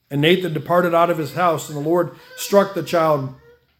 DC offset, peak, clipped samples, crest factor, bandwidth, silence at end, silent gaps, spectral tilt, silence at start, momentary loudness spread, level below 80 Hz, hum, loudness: under 0.1%; 0 dBFS; under 0.1%; 18 dB; 18 kHz; 0.45 s; none; -5.5 dB/octave; 0.1 s; 7 LU; -62 dBFS; none; -19 LUFS